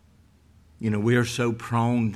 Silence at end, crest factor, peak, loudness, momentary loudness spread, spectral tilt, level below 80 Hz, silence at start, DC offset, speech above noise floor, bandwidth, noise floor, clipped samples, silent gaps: 0 s; 16 dB; -10 dBFS; -25 LUFS; 6 LU; -6.5 dB/octave; -56 dBFS; 0.8 s; under 0.1%; 33 dB; 14 kHz; -57 dBFS; under 0.1%; none